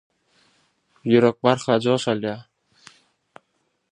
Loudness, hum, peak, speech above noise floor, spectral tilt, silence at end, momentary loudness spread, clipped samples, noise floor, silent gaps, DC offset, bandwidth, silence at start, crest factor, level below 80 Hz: -21 LUFS; none; -2 dBFS; 52 dB; -6 dB/octave; 1.5 s; 14 LU; under 0.1%; -71 dBFS; none; under 0.1%; 10.5 kHz; 1.05 s; 22 dB; -66 dBFS